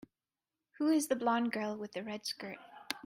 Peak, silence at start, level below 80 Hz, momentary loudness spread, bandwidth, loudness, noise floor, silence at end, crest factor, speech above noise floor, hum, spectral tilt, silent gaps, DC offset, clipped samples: -14 dBFS; 0.8 s; -80 dBFS; 12 LU; 16 kHz; -35 LUFS; under -90 dBFS; 0.05 s; 22 dB; over 56 dB; none; -3.5 dB/octave; none; under 0.1%; under 0.1%